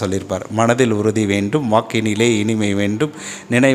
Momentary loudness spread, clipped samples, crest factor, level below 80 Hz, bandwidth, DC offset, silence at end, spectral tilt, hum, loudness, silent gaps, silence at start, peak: 7 LU; under 0.1%; 16 dB; -56 dBFS; 15 kHz; under 0.1%; 0 s; -5.5 dB/octave; none; -17 LUFS; none; 0 s; 0 dBFS